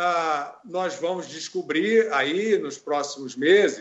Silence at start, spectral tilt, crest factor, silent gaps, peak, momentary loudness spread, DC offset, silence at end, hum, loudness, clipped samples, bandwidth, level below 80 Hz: 0 s; -3.5 dB/octave; 16 dB; none; -6 dBFS; 12 LU; under 0.1%; 0 s; none; -24 LUFS; under 0.1%; 8.2 kHz; -76 dBFS